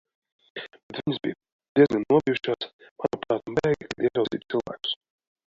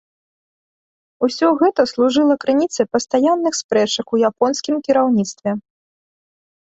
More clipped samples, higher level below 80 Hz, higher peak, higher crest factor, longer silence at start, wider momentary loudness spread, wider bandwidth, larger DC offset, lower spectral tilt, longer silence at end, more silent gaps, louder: neither; about the same, -60 dBFS vs -62 dBFS; second, -6 dBFS vs -2 dBFS; about the same, 20 dB vs 18 dB; second, 0.55 s vs 1.2 s; first, 17 LU vs 7 LU; about the same, 7.6 kHz vs 8.2 kHz; neither; first, -6.5 dB/octave vs -4 dB/octave; second, 0.55 s vs 1.1 s; first, 0.83-0.89 s, 1.52-1.59 s, 1.69-1.76 s, 2.73-2.79 s, 2.91-2.96 s vs 3.64-3.69 s; second, -26 LUFS vs -17 LUFS